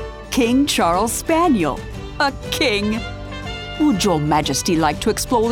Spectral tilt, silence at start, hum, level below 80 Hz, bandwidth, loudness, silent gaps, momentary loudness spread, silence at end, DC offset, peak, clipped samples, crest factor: -4 dB/octave; 0 s; none; -36 dBFS; 18 kHz; -18 LUFS; none; 12 LU; 0 s; under 0.1%; -4 dBFS; under 0.1%; 14 dB